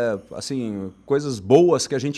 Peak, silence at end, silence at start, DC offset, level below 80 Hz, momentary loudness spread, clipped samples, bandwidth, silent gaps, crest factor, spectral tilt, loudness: -2 dBFS; 0 s; 0 s; under 0.1%; -58 dBFS; 14 LU; under 0.1%; 12.5 kHz; none; 18 dB; -5.5 dB/octave; -21 LUFS